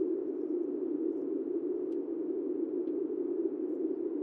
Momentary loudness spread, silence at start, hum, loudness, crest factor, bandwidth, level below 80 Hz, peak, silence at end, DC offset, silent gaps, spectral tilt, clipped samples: 1 LU; 0 s; none; -35 LUFS; 14 dB; 2.5 kHz; under -90 dBFS; -20 dBFS; 0 s; under 0.1%; none; -9.5 dB/octave; under 0.1%